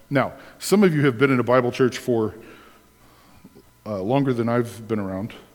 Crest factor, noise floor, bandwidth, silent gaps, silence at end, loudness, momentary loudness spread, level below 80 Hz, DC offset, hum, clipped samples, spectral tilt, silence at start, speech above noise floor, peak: 20 dB; -53 dBFS; 19 kHz; none; 0.15 s; -22 LUFS; 12 LU; -60 dBFS; under 0.1%; none; under 0.1%; -6.5 dB/octave; 0.1 s; 32 dB; -2 dBFS